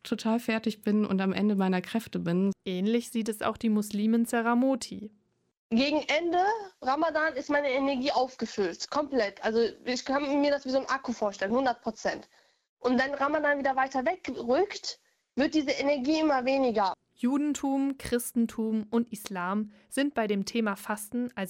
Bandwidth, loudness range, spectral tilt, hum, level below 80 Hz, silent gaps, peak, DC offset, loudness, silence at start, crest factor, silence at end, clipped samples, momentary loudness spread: 16.5 kHz; 2 LU; -5 dB/octave; none; -64 dBFS; 5.57-5.70 s, 12.69-12.77 s; -12 dBFS; under 0.1%; -29 LUFS; 0.05 s; 16 dB; 0 s; under 0.1%; 7 LU